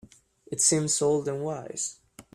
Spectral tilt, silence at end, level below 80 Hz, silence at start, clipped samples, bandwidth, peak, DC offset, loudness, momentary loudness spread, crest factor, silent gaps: -3.5 dB/octave; 0.15 s; -66 dBFS; 0.5 s; under 0.1%; 14.5 kHz; -6 dBFS; under 0.1%; -26 LUFS; 11 LU; 22 dB; none